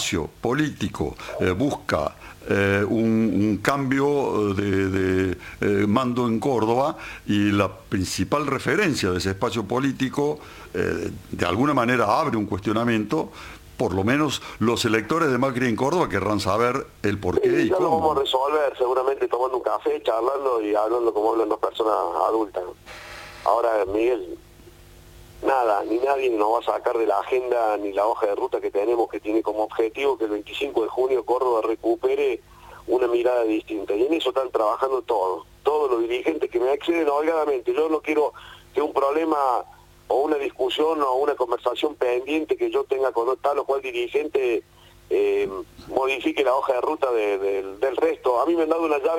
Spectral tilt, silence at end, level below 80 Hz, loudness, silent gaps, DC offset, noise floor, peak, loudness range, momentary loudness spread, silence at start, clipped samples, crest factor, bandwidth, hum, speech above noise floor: -5.5 dB/octave; 0 s; -52 dBFS; -23 LUFS; none; under 0.1%; -47 dBFS; -2 dBFS; 2 LU; 6 LU; 0 s; under 0.1%; 20 dB; 17 kHz; none; 25 dB